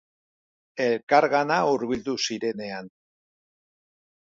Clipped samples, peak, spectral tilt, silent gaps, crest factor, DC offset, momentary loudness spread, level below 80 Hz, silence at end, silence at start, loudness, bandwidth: under 0.1%; -6 dBFS; -4 dB/octave; 1.03-1.07 s; 20 dB; under 0.1%; 15 LU; -64 dBFS; 1.45 s; 0.75 s; -24 LUFS; 7.8 kHz